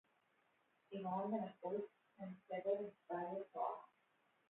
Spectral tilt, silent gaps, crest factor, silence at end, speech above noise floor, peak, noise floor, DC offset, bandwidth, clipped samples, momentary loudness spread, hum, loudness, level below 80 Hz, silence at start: -4 dB/octave; none; 18 dB; 0.65 s; 35 dB; -28 dBFS; -80 dBFS; under 0.1%; 3.9 kHz; under 0.1%; 12 LU; none; -46 LUFS; under -90 dBFS; 0.9 s